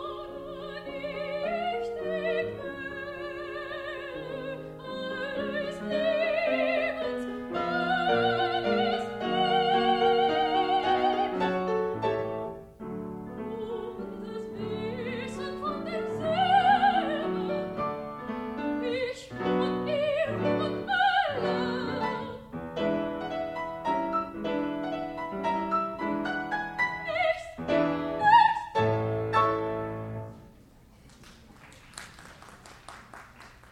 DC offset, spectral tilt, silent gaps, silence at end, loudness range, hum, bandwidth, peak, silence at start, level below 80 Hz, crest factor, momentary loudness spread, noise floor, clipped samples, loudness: under 0.1%; -6 dB/octave; none; 0.05 s; 9 LU; none; 13.5 kHz; -8 dBFS; 0 s; -58 dBFS; 20 dB; 14 LU; -55 dBFS; under 0.1%; -29 LUFS